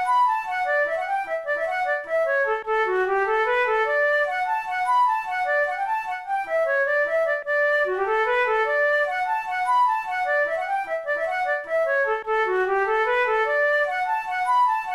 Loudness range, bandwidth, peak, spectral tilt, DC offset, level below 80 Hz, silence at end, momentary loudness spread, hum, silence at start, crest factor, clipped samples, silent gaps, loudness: 1 LU; 13 kHz; -12 dBFS; -3 dB/octave; 0.1%; -60 dBFS; 0 s; 5 LU; none; 0 s; 10 dB; under 0.1%; none; -22 LUFS